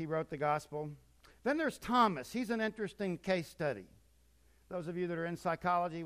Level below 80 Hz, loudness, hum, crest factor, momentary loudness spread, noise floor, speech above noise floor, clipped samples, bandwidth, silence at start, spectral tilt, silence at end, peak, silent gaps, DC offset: -66 dBFS; -36 LUFS; none; 20 dB; 12 LU; -68 dBFS; 32 dB; under 0.1%; 15.5 kHz; 0 s; -6 dB/octave; 0 s; -16 dBFS; none; under 0.1%